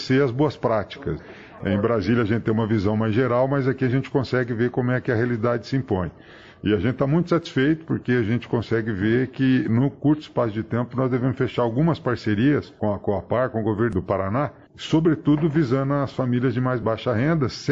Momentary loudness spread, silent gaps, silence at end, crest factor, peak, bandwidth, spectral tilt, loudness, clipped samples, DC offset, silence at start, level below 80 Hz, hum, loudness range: 5 LU; none; 0 s; 16 dB; -6 dBFS; 7.6 kHz; -8 dB/octave; -23 LUFS; under 0.1%; under 0.1%; 0 s; -50 dBFS; none; 1 LU